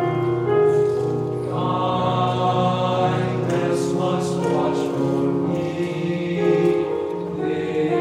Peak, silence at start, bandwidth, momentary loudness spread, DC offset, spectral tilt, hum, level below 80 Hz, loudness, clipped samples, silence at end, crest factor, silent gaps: -8 dBFS; 0 s; 12.5 kHz; 6 LU; under 0.1%; -7 dB/octave; none; -60 dBFS; -21 LUFS; under 0.1%; 0 s; 14 dB; none